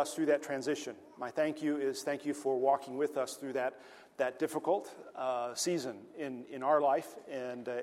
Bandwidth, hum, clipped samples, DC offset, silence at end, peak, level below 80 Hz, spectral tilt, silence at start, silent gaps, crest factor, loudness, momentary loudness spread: 16 kHz; none; under 0.1%; under 0.1%; 0 s; -16 dBFS; -84 dBFS; -4 dB/octave; 0 s; none; 18 dB; -35 LUFS; 12 LU